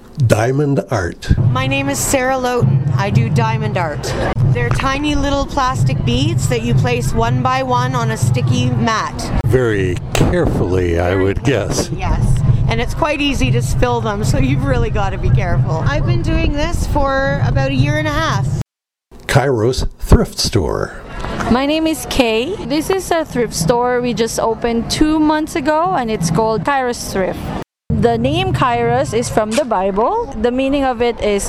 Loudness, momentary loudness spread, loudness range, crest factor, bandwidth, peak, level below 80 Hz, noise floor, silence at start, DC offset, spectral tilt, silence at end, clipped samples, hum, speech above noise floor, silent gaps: -16 LUFS; 5 LU; 1 LU; 14 dB; 15.5 kHz; 0 dBFS; -26 dBFS; -54 dBFS; 0 s; under 0.1%; -5.5 dB/octave; 0 s; under 0.1%; none; 39 dB; none